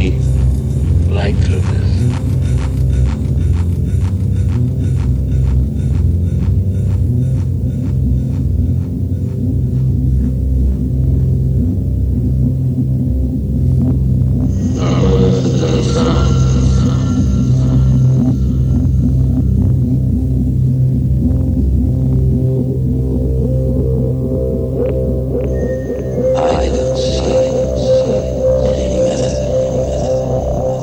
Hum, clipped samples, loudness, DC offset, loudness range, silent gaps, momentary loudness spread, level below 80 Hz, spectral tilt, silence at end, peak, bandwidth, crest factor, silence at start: none; under 0.1%; -15 LUFS; under 0.1%; 3 LU; none; 4 LU; -20 dBFS; -8 dB/octave; 0 s; -2 dBFS; 9.2 kHz; 12 dB; 0 s